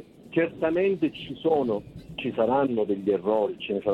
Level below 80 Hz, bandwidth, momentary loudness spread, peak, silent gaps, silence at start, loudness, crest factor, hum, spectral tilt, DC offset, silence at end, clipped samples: -58 dBFS; 5.2 kHz; 7 LU; -12 dBFS; none; 0 s; -26 LUFS; 14 dB; none; -8 dB/octave; under 0.1%; 0 s; under 0.1%